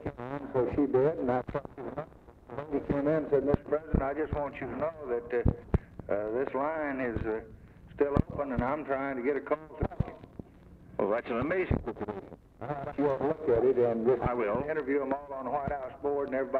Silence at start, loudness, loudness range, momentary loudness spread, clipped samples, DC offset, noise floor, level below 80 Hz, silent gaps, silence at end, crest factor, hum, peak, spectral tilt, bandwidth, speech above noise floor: 0 s; -31 LUFS; 4 LU; 12 LU; under 0.1%; under 0.1%; -53 dBFS; -44 dBFS; none; 0 s; 22 dB; none; -8 dBFS; -10 dB/octave; 5 kHz; 23 dB